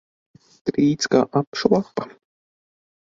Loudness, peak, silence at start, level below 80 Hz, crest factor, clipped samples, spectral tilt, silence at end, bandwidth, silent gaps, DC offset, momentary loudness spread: -21 LUFS; -2 dBFS; 0.65 s; -60 dBFS; 20 dB; under 0.1%; -5.5 dB/octave; 0.95 s; 7.8 kHz; 1.47-1.52 s; under 0.1%; 12 LU